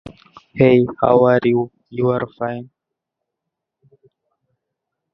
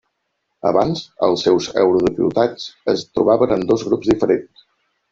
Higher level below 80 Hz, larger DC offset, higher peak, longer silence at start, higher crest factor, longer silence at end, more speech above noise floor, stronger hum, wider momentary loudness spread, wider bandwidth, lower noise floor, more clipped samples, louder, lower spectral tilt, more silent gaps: about the same, -52 dBFS vs -50 dBFS; neither; about the same, 0 dBFS vs -2 dBFS; second, 0.05 s vs 0.65 s; about the same, 20 dB vs 16 dB; first, 2.5 s vs 0.7 s; first, 66 dB vs 56 dB; neither; first, 14 LU vs 6 LU; second, 5.8 kHz vs 7.6 kHz; first, -81 dBFS vs -73 dBFS; neither; about the same, -17 LUFS vs -18 LUFS; first, -10 dB/octave vs -6 dB/octave; neither